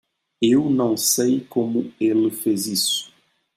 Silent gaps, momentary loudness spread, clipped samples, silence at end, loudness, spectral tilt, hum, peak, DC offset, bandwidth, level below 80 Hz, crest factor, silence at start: none; 5 LU; under 0.1%; 0.5 s; -20 LUFS; -3.5 dB/octave; none; -6 dBFS; under 0.1%; 16 kHz; -66 dBFS; 16 dB; 0.4 s